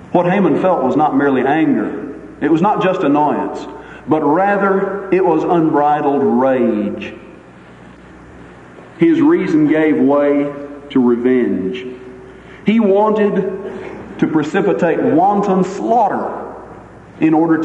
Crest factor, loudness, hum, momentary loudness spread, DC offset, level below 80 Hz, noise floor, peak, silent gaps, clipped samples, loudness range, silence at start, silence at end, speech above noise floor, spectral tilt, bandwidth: 14 dB; -14 LUFS; none; 15 LU; under 0.1%; -50 dBFS; -39 dBFS; 0 dBFS; none; under 0.1%; 3 LU; 0 s; 0 s; 25 dB; -8 dB/octave; 8.2 kHz